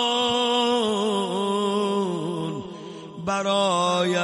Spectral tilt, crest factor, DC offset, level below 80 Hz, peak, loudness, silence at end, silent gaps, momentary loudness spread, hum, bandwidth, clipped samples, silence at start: -4 dB/octave; 14 dB; under 0.1%; -64 dBFS; -10 dBFS; -23 LUFS; 0 s; none; 12 LU; none; 11.5 kHz; under 0.1%; 0 s